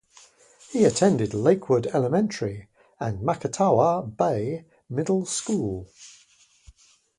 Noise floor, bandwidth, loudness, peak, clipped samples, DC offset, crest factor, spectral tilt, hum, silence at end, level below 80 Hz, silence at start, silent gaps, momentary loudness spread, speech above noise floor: -59 dBFS; 11.5 kHz; -24 LUFS; -6 dBFS; under 0.1%; under 0.1%; 20 dB; -6 dB/octave; none; 1.1 s; -56 dBFS; 0.7 s; none; 13 LU; 36 dB